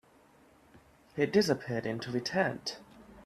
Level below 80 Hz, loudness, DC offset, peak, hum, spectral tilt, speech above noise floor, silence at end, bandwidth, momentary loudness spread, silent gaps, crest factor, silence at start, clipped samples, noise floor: -66 dBFS; -32 LUFS; under 0.1%; -12 dBFS; none; -5 dB/octave; 31 dB; 0.05 s; 15 kHz; 13 LU; none; 20 dB; 0.75 s; under 0.1%; -62 dBFS